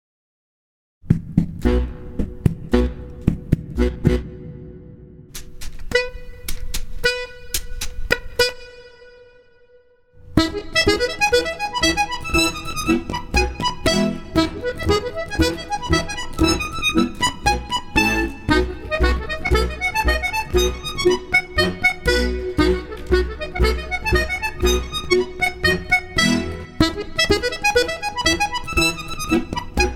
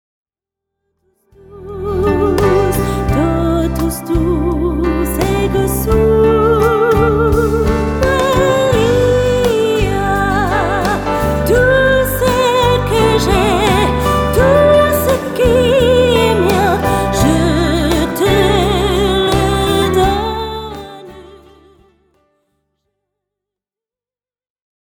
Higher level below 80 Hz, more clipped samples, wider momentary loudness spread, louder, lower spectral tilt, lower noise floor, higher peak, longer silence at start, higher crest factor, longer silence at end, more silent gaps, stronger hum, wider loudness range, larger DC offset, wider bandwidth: about the same, -28 dBFS vs -24 dBFS; neither; first, 10 LU vs 5 LU; second, -20 LUFS vs -13 LUFS; second, -4 dB/octave vs -5.5 dB/octave; second, -54 dBFS vs under -90 dBFS; about the same, 0 dBFS vs 0 dBFS; second, 1.05 s vs 1.5 s; first, 20 dB vs 14 dB; second, 0 s vs 3.7 s; neither; neither; about the same, 6 LU vs 5 LU; neither; second, 17.5 kHz vs 19.5 kHz